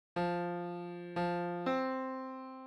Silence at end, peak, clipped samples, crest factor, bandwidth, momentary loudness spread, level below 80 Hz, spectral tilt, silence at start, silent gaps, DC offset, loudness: 0 s; -22 dBFS; under 0.1%; 16 dB; 9.4 kHz; 8 LU; -72 dBFS; -7.5 dB/octave; 0.15 s; none; under 0.1%; -37 LUFS